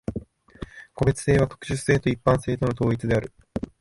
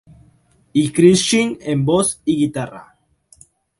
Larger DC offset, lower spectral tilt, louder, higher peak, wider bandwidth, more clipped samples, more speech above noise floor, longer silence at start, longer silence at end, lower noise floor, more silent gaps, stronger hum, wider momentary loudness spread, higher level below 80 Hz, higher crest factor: neither; first, -6.5 dB/octave vs -5 dB/octave; second, -24 LUFS vs -16 LUFS; second, -6 dBFS vs 0 dBFS; about the same, 11.5 kHz vs 11.5 kHz; neither; second, 19 dB vs 39 dB; second, 0.1 s vs 0.75 s; second, 0.15 s vs 1 s; second, -41 dBFS vs -55 dBFS; neither; neither; first, 18 LU vs 9 LU; first, -42 dBFS vs -52 dBFS; about the same, 18 dB vs 18 dB